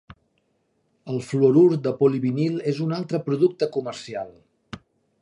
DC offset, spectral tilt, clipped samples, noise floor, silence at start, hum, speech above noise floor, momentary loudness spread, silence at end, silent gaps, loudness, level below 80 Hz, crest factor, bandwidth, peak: under 0.1%; -8 dB/octave; under 0.1%; -69 dBFS; 1.05 s; none; 48 dB; 22 LU; 0.45 s; none; -22 LUFS; -64 dBFS; 18 dB; 11 kHz; -6 dBFS